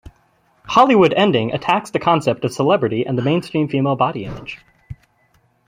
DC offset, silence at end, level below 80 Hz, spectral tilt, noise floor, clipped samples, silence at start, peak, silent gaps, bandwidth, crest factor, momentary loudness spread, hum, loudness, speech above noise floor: under 0.1%; 0.75 s; -50 dBFS; -6.5 dB/octave; -59 dBFS; under 0.1%; 0.65 s; 0 dBFS; none; 15.5 kHz; 18 dB; 15 LU; none; -17 LUFS; 43 dB